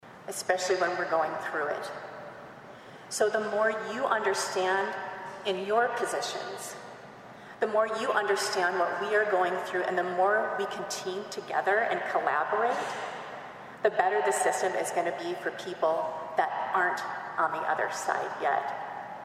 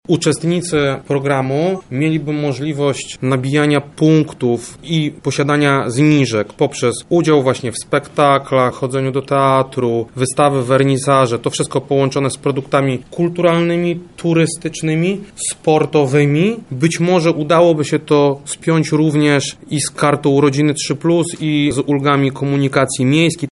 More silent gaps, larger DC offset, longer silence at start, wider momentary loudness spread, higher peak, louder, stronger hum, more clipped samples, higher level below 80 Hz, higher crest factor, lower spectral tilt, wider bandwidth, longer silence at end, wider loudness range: neither; neither; about the same, 0.05 s vs 0.1 s; first, 14 LU vs 6 LU; second, -10 dBFS vs 0 dBFS; second, -29 LUFS vs -15 LUFS; neither; neither; second, -76 dBFS vs -52 dBFS; first, 20 dB vs 14 dB; second, -2.5 dB/octave vs -5.5 dB/octave; first, 15.5 kHz vs 11.5 kHz; about the same, 0 s vs 0.05 s; about the same, 3 LU vs 2 LU